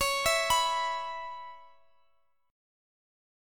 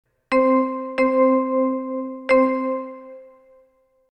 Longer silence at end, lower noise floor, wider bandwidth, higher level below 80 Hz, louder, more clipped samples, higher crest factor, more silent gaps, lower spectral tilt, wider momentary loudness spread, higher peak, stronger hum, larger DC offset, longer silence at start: first, 1.85 s vs 0.85 s; first, -73 dBFS vs -60 dBFS; first, 17.5 kHz vs 8.8 kHz; about the same, -56 dBFS vs -60 dBFS; second, -28 LUFS vs -20 LUFS; neither; first, 20 dB vs 14 dB; neither; second, 0.5 dB/octave vs -6 dB/octave; first, 18 LU vs 11 LU; second, -14 dBFS vs -6 dBFS; neither; neither; second, 0 s vs 0.3 s